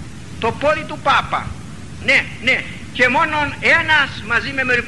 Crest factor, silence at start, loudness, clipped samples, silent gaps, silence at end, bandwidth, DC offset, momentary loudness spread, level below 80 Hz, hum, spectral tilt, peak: 16 dB; 0 s; -16 LUFS; under 0.1%; none; 0 s; 12 kHz; 1%; 12 LU; -42 dBFS; none; -4 dB/octave; -2 dBFS